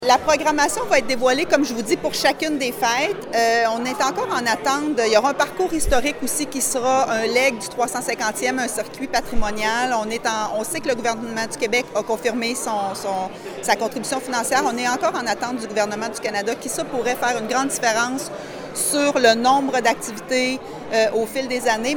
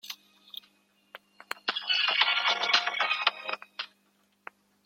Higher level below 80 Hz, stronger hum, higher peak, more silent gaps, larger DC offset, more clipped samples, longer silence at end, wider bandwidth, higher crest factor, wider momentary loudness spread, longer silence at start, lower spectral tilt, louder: first, -42 dBFS vs under -90 dBFS; neither; about the same, -2 dBFS vs -4 dBFS; neither; neither; neither; second, 0 s vs 1 s; first, over 20 kHz vs 16.5 kHz; second, 20 dB vs 26 dB; second, 7 LU vs 21 LU; about the same, 0 s vs 0.05 s; first, -2.5 dB/octave vs 1 dB/octave; first, -21 LUFS vs -26 LUFS